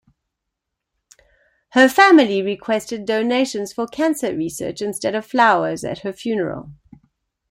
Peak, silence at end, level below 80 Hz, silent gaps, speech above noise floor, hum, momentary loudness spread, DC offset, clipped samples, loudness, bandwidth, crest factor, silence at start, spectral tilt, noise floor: 0 dBFS; 0.8 s; -58 dBFS; none; 62 dB; none; 14 LU; under 0.1%; under 0.1%; -18 LUFS; 16.5 kHz; 20 dB; 1.75 s; -4 dB/octave; -80 dBFS